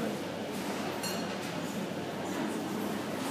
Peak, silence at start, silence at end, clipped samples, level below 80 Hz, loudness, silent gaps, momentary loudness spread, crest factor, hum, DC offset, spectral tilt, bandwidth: -22 dBFS; 0 s; 0 s; under 0.1%; -70 dBFS; -35 LUFS; none; 2 LU; 14 dB; none; under 0.1%; -4.5 dB/octave; 15.5 kHz